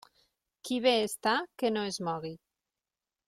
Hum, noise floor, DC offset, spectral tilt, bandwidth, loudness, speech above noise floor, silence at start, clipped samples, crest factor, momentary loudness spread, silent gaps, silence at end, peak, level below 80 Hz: none; under -90 dBFS; under 0.1%; -3.5 dB/octave; 16.5 kHz; -30 LUFS; over 60 dB; 0.65 s; under 0.1%; 20 dB; 12 LU; none; 0.9 s; -14 dBFS; -72 dBFS